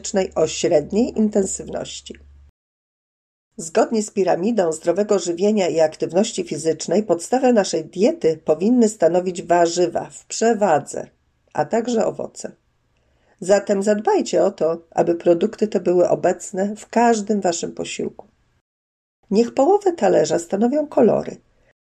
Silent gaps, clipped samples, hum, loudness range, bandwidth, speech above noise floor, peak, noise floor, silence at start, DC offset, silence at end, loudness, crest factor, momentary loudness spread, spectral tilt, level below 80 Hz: 2.49-3.51 s, 18.61-19.23 s; under 0.1%; none; 5 LU; 12 kHz; 45 dB; -4 dBFS; -63 dBFS; 0.05 s; under 0.1%; 0.45 s; -19 LUFS; 16 dB; 12 LU; -5 dB/octave; -56 dBFS